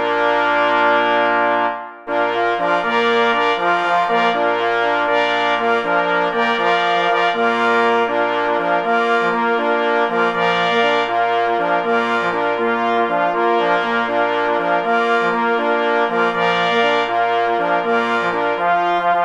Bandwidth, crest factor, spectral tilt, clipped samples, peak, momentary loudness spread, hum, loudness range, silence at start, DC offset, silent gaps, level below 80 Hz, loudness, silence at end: 9.4 kHz; 14 dB; -4.5 dB/octave; under 0.1%; -2 dBFS; 3 LU; none; 1 LU; 0 s; under 0.1%; none; -58 dBFS; -16 LUFS; 0 s